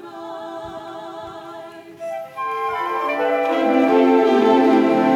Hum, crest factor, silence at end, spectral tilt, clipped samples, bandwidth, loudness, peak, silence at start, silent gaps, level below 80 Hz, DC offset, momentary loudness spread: none; 16 dB; 0 s; -6 dB/octave; under 0.1%; 13 kHz; -17 LUFS; -4 dBFS; 0 s; none; -64 dBFS; under 0.1%; 19 LU